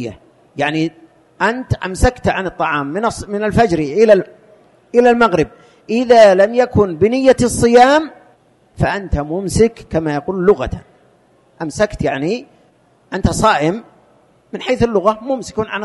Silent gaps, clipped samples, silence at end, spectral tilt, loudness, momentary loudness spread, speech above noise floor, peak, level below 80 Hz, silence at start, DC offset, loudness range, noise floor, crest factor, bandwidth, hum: none; under 0.1%; 0 s; -5.5 dB/octave; -15 LUFS; 13 LU; 39 dB; 0 dBFS; -32 dBFS; 0 s; under 0.1%; 7 LU; -53 dBFS; 16 dB; 11.5 kHz; none